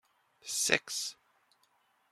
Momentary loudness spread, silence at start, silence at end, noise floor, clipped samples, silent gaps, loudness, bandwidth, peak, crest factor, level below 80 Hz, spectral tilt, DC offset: 13 LU; 0.45 s; 1 s; -72 dBFS; under 0.1%; none; -32 LUFS; 16 kHz; -6 dBFS; 32 dB; -78 dBFS; -0.5 dB/octave; under 0.1%